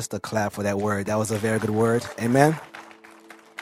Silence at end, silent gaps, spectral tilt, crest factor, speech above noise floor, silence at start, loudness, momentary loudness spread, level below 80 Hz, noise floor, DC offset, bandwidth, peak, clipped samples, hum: 0 s; none; -6 dB/octave; 24 dB; 25 dB; 0 s; -24 LUFS; 15 LU; -60 dBFS; -48 dBFS; under 0.1%; 16 kHz; 0 dBFS; under 0.1%; none